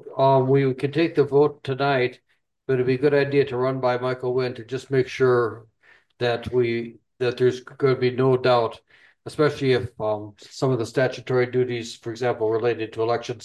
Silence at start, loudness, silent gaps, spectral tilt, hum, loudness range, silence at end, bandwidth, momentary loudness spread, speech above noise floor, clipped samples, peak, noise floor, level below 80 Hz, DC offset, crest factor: 0.05 s; -23 LUFS; none; -7 dB/octave; none; 3 LU; 0 s; 10.5 kHz; 9 LU; 36 dB; under 0.1%; -6 dBFS; -58 dBFS; -58 dBFS; under 0.1%; 16 dB